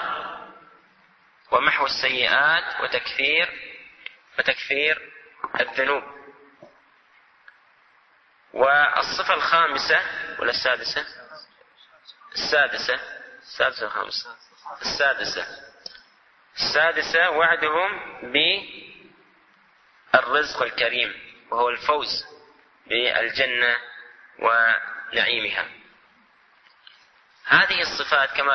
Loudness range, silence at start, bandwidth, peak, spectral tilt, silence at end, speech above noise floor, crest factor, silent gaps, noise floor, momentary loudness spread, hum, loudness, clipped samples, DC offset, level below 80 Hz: 5 LU; 0 s; 6.4 kHz; -2 dBFS; -2 dB/octave; 0 s; 37 dB; 22 dB; none; -59 dBFS; 21 LU; none; -21 LUFS; under 0.1%; under 0.1%; -62 dBFS